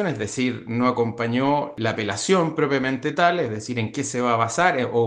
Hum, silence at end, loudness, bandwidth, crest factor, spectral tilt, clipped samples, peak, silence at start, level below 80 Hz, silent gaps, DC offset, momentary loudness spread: none; 0 s; -22 LUFS; 10 kHz; 18 dB; -5 dB/octave; under 0.1%; -4 dBFS; 0 s; -62 dBFS; none; under 0.1%; 6 LU